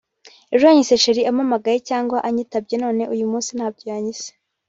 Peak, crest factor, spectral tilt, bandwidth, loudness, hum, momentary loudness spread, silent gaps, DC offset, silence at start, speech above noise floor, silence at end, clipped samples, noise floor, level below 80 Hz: -2 dBFS; 18 dB; -3.5 dB/octave; 8 kHz; -19 LUFS; none; 13 LU; none; under 0.1%; 0.25 s; 24 dB; 0.4 s; under 0.1%; -42 dBFS; -64 dBFS